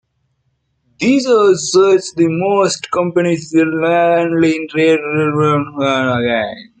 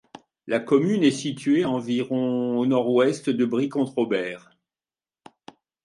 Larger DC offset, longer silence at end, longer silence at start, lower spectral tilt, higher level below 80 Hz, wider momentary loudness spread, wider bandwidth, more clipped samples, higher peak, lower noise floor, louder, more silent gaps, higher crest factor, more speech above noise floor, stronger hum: neither; second, 0.15 s vs 1.45 s; first, 1 s vs 0.45 s; about the same, -5 dB/octave vs -6 dB/octave; first, -56 dBFS vs -72 dBFS; about the same, 5 LU vs 7 LU; second, 9.4 kHz vs 11.5 kHz; neither; first, -2 dBFS vs -6 dBFS; second, -65 dBFS vs under -90 dBFS; first, -14 LUFS vs -23 LUFS; neither; second, 12 dB vs 18 dB; second, 52 dB vs over 68 dB; neither